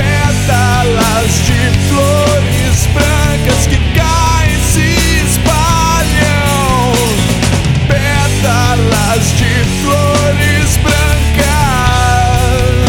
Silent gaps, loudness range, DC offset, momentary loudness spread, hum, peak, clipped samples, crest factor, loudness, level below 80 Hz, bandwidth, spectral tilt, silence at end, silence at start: none; 0 LU; under 0.1%; 1 LU; none; 0 dBFS; under 0.1%; 10 dB; -10 LUFS; -18 dBFS; 18.5 kHz; -4.5 dB/octave; 0 s; 0 s